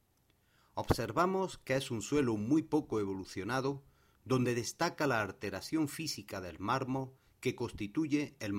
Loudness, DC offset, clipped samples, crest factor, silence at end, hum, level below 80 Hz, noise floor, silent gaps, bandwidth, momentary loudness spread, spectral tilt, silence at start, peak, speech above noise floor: -35 LUFS; under 0.1%; under 0.1%; 24 dB; 0 s; none; -58 dBFS; -72 dBFS; none; 16 kHz; 9 LU; -5.5 dB/octave; 0.75 s; -12 dBFS; 38 dB